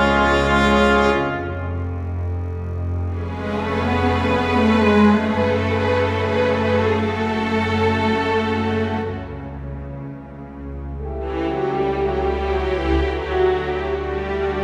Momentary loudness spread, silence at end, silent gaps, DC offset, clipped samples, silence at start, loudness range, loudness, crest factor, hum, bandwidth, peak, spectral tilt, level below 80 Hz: 16 LU; 0 s; none; under 0.1%; under 0.1%; 0 s; 7 LU; -20 LUFS; 16 dB; none; 10.5 kHz; -2 dBFS; -7 dB/octave; -34 dBFS